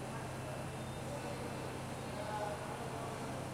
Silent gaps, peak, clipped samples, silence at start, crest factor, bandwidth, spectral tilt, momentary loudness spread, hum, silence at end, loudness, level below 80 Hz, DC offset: none; -28 dBFS; under 0.1%; 0 s; 14 dB; 16.5 kHz; -5 dB/octave; 3 LU; none; 0 s; -43 LUFS; -60 dBFS; under 0.1%